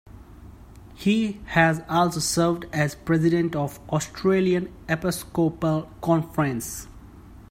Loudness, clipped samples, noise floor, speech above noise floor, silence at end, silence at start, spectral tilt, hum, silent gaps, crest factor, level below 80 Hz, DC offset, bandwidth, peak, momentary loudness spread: -24 LUFS; under 0.1%; -45 dBFS; 22 dB; 0.1 s; 0.05 s; -5.5 dB/octave; none; none; 20 dB; -48 dBFS; under 0.1%; 16 kHz; -4 dBFS; 7 LU